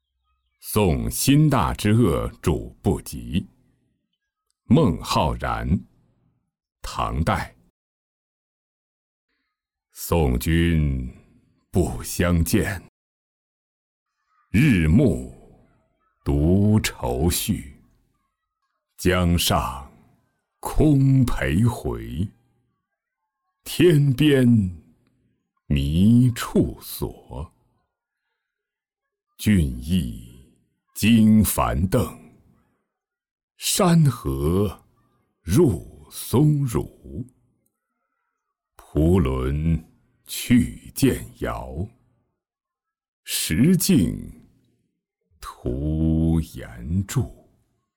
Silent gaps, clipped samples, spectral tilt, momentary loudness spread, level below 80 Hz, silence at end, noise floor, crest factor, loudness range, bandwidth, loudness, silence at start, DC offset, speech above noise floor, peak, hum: 7.70-9.28 s, 12.89-14.06 s, 33.31-33.36 s, 33.43-33.48 s, 43.08-43.23 s; under 0.1%; -6 dB/octave; 17 LU; -36 dBFS; 0.65 s; -88 dBFS; 16 dB; 6 LU; 19 kHz; -21 LUFS; 0.65 s; under 0.1%; 68 dB; -6 dBFS; none